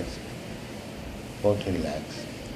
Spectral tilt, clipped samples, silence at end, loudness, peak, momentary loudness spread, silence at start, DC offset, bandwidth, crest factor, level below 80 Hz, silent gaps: -6 dB/octave; under 0.1%; 0 s; -32 LUFS; -10 dBFS; 12 LU; 0 s; under 0.1%; 15 kHz; 20 dB; -46 dBFS; none